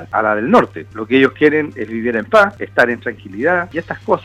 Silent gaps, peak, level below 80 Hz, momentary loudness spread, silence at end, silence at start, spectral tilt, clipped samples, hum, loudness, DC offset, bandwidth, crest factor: none; 0 dBFS; -52 dBFS; 11 LU; 0 s; 0 s; -6.5 dB/octave; under 0.1%; none; -15 LUFS; under 0.1%; 13 kHz; 16 dB